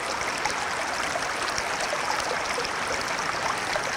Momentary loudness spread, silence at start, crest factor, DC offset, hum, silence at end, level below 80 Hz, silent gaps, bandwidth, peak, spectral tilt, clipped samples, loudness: 1 LU; 0 s; 20 dB; under 0.1%; none; 0 s; -54 dBFS; none; 18 kHz; -8 dBFS; -1.5 dB/octave; under 0.1%; -27 LUFS